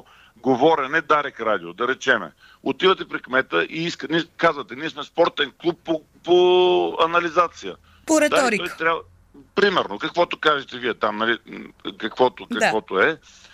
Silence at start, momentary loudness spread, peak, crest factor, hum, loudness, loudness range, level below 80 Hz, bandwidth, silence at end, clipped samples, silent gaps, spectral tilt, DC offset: 0.45 s; 11 LU; -4 dBFS; 18 dB; none; -21 LUFS; 3 LU; -60 dBFS; 14 kHz; 0.35 s; under 0.1%; none; -4 dB/octave; under 0.1%